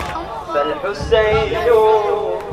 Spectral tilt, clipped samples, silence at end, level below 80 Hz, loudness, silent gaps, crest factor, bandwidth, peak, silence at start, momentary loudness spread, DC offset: -5.5 dB/octave; under 0.1%; 0 s; -34 dBFS; -16 LUFS; none; 16 dB; 13.5 kHz; 0 dBFS; 0 s; 10 LU; under 0.1%